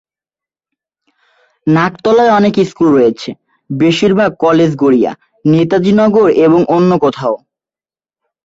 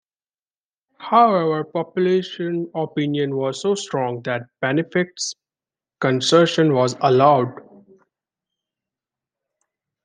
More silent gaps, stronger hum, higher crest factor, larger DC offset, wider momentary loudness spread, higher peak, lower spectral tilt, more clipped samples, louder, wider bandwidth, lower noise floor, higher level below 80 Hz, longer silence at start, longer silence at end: neither; neither; second, 12 dB vs 20 dB; neither; about the same, 10 LU vs 11 LU; about the same, 0 dBFS vs -2 dBFS; first, -7 dB/octave vs -5 dB/octave; neither; first, -11 LUFS vs -20 LUFS; second, 8 kHz vs 10 kHz; about the same, under -90 dBFS vs under -90 dBFS; first, -50 dBFS vs -70 dBFS; first, 1.65 s vs 1 s; second, 1.1 s vs 2.45 s